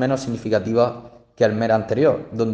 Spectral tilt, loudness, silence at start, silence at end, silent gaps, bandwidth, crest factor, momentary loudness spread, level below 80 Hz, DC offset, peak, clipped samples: -7 dB/octave; -20 LUFS; 0 s; 0 s; none; 9.2 kHz; 16 dB; 6 LU; -56 dBFS; under 0.1%; -4 dBFS; under 0.1%